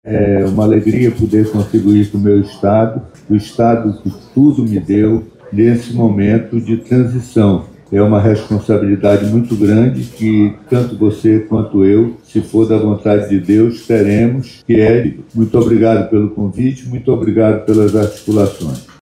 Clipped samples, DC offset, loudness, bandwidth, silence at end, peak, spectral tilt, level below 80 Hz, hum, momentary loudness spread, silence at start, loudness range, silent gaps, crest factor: under 0.1%; under 0.1%; -13 LUFS; 12.5 kHz; 0.2 s; 0 dBFS; -8.5 dB/octave; -40 dBFS; none; 7 LU; 0.05 s; 1 LU; none; 12 dB